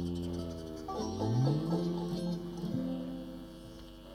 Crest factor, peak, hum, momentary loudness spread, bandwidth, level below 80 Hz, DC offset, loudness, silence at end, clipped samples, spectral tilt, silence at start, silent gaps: 16 dB; -18 dBFS; none; 17 LU; 15.5 kHz; -54 dBFS; under 0.1%; -36 LUFS; 0 s; under 0.1%; -7.5 dB/octave; 0 s; none